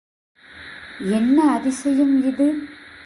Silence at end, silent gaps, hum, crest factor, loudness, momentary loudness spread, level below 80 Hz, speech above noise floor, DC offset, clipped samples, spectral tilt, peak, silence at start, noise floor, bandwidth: 0.2 s; none; none; 14 dB; -19 LUFS; 21 LU; -58 dBFS; 22 dB; under 0.1%; under 0.1%; -5.5 dB/octave; -6 dBFS; 0.55 s; -40 dBFS; 11.5 kHz